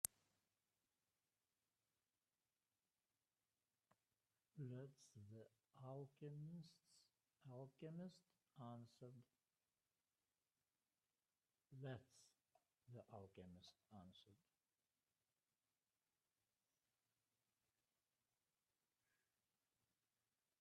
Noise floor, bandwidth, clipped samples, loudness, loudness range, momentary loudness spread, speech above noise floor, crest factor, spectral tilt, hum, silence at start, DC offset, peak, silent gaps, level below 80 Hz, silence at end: under -90 dBFS; 10.5 kHz; under 0.1%; -60 LUFS; 7 LU; 10 LU; over 30 dB; 42 dB; -5 dB/octave; none; 0.05 s; under 0.1%; -22 dBFS; none; under -90 dBFS; 6.25 s